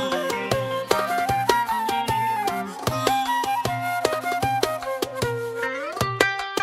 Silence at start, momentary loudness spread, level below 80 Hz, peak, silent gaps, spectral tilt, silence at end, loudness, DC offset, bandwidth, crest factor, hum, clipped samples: 0 s; 6 LU; -50 dBFS; -2 dBFS; none; -4 dB/octave; 0 s; -24 LUFS; under 0.1%; 16 kHz; 22 dB; none; under 0.1%